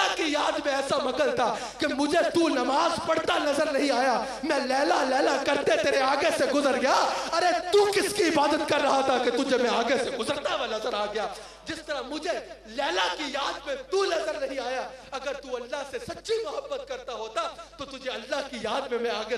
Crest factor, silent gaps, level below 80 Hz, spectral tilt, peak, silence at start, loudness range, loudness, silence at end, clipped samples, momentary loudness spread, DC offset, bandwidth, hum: 18 dB; none; -58 dBFS; -2.5 dB/octave; -8 dBFS; 0 s; 9 LU; -26 LUFS; 0 s; under 0.1%; 11 LU; under 0.1%; 13 kHz; none